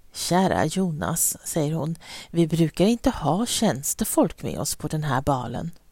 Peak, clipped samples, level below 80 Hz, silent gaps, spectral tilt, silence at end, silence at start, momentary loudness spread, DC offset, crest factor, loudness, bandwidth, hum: -6 dBFS; under 0.1%; -46 dBFS; none; -4.5 dB/octave; 0.15 s; 0.15 s; 8 LU; under 0.1%; 18 dB; -24 LUFS; 16.5 kHz; none